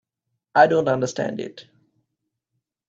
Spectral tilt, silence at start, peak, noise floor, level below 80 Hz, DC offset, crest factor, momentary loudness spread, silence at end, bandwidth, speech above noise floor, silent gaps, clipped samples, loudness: -5.5 dB/octave; 0.55 s; -2 dBFS; -80 dBFS; -66 dBFS; under 0.1%; 22 dB; 15 LU; 1.25 s; 7.8 kHz; 60 dB; none; under 0.1%; -20 LUFS